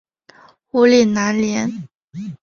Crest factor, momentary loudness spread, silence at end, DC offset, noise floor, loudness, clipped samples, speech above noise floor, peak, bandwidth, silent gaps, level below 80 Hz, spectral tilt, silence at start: 16 dB; 21 LU; 0.05 s; under 0.1%; -49 dBFS; -16 LUFS; under 0.1%; 33 dB; -2 dBFS; 7.2 kHz; 1.95-2.08 s; -56 dBFS; -5 dB/octave; 0.75 s